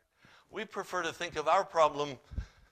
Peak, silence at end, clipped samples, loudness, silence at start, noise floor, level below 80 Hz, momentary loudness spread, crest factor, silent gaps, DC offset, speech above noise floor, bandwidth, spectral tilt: -12 dBFS; 0.25 s; under 0.1%; -32 LUFS; 0.55 s; -63 dBFS; -52 dBFS; 16 LU; 22 dB; none; under 0.1%; 31 dB; 14.5 kHz; -4 dB/octave